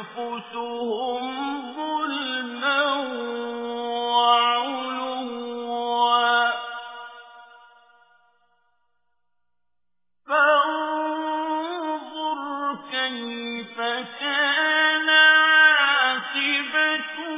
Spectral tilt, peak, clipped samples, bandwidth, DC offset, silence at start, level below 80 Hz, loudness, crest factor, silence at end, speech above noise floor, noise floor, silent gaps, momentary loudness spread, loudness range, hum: 2.5 dB/octave; -4 dBFS; under 0.1%; 3.9 kHz; under 0.1%; 0 s; -82 dBFS; -22 LUFS; 18 dB; 0 s; 58 dB; -87 dBFS; none; 15 LU; 9 LU; none